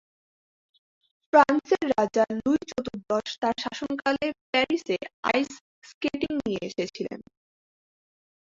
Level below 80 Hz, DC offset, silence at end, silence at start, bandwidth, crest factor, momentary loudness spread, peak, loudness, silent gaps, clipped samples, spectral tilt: -62 dBFS; under 0.1%; 1.25 s; 1.35 s; 7.8 kHz; 24 dB; 11 LU; -4 dBFS; -26 LUFS; 4.41-4.53 s, 5.14-5.23 s, 5.61-5.82 s, 5.94-6.01 s; under 0.1%; -4.5 dB/octave